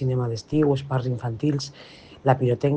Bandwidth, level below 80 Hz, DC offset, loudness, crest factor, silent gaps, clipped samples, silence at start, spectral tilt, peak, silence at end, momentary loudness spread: 8.6 kHz; -56 dBFS; under 0.1%; -24 LUFS; 20 dB; none; under 0.1%; 0 s; -7.5 dB/octave; -4 dBFS; 0 s; 12 LU